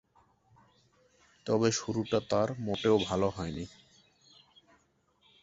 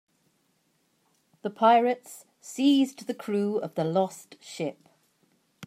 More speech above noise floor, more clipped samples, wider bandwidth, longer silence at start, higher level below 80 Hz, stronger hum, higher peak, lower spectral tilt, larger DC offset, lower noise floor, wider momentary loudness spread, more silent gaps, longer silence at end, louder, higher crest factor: second, 40 dB vs 45 dB; neither; second, 8 kHz vs 15.5 kHz; about the same, 1.45 s vs 1.45 s; first, -58 dBFS vs -82 dBFS; neither; second, -12 dBFS vs -8 dBFS; about the same, -5 dB/octave vs -5.5 dB/octave; neither; about the same, -71 dBFS vs -71 dBFS; second, 13 LU vs 21 LU; neither; first, 1.75 s vs 0 s; second, -31 LUFS vs -26 LUFS; about the same, 22 dB vs 20 dB